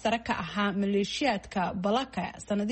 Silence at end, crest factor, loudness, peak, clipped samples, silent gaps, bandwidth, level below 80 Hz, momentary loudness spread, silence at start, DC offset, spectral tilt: 0 s; 16 dB; -30 LUFS; -14 dBFS; under 0.1%; none; 8.4 kHz; -56 dBFS; 5 LU; 0 s; under 0.1%; -5 dB/octave